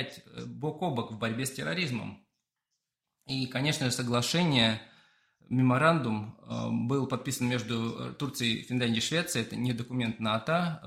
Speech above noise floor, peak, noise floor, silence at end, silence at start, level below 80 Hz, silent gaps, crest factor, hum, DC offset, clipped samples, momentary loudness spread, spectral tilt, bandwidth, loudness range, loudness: 55 dB; -10 dBFS; -85 dBFS; 0 s; 0 s; -66 dBFS; none; 22 dB; none; under 0.1%; under 0.1%; 11 LU; -4.5 dB/octave; 16 kHz; 6 LU; -30 LUFS